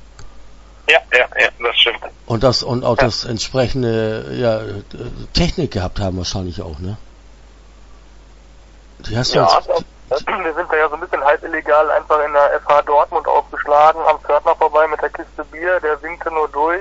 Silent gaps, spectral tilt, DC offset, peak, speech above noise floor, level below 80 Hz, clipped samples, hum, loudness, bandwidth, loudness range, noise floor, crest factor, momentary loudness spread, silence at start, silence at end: none; -4.5 dB/octave; under 0.1%; 0 dBFS; 25 dB; -36 dBFS; under 0.1%; none; -16 LUFS; 8 kHz; 9 LU; -42 dBFS; 18 dB; 12 LU; 0 s; 0 s